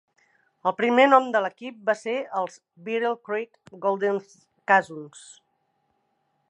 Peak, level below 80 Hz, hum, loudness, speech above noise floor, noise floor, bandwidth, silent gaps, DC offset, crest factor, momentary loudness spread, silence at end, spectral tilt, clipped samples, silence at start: -4 dBFS; -82 dBFS; none; -24 LUFS; 48 dB; -72 dBFS; 10.5 kHz; none; under 0.1%; 22 dB; 21 LU; 1.4 s; -4.5 dB/octave; under 0.1%; 0.65 s